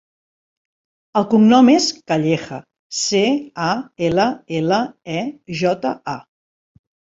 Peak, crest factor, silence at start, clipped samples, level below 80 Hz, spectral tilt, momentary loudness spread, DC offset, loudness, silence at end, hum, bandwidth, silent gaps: -2 dBFS; 18 dB; 1.15 s; under 0.1%; -58 dBFS; -5 dB/octave; 15 LU; under 0.1%; -18 LUFS; 1 s; none; 7.8 kHz; 2.79-2.90 s